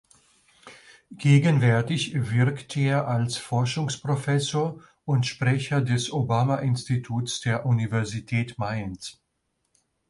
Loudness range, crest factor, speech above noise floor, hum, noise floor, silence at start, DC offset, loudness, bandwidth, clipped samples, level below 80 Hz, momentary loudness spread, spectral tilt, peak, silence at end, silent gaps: 3 LU; 18 dB; 52 dB; none; -75 dBFS; 0.65 s; under 0.1%; -25 LUFS; 11.5 kHz; under 0.1%; -58 dBFS; 9 LU; -6 dB/octave; -8 dBFS; 1 s; none